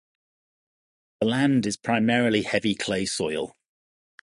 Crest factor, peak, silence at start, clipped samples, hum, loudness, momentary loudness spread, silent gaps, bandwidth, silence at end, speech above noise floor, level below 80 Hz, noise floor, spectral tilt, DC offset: 18 dB; -8 dBFS; 1.2 s; under 0.1%; none; -24 LUFS; 7 LU; none; 11.5 kHz; 0.75 s; over 66 dB; -60 dBFS; under -90 dBFS; -4.5 dB/octave; under 0.1%